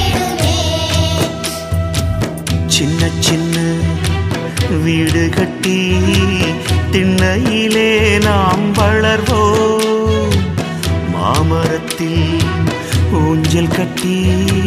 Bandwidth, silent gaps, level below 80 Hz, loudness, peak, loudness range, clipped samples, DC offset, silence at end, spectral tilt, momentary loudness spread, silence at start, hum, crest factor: 15.5 kHz; none; -28 dBFS; -14 LUFS; 0 dBFS; 3 LU; under 0.1%; under 0.1%; 0 s; -5 dB/octave; 6 LU; 0 s; none; 14 dB